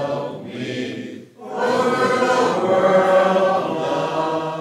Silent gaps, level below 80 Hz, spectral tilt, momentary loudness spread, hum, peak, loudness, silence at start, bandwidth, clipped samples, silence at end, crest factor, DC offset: none; -76 dBFS; -5 dB/octave; 14 LU; none; -4 dBFS; -19 LUFS; 0 s; 13 kHz; under 0.1%; 0 s; 14 dB; under 0.1%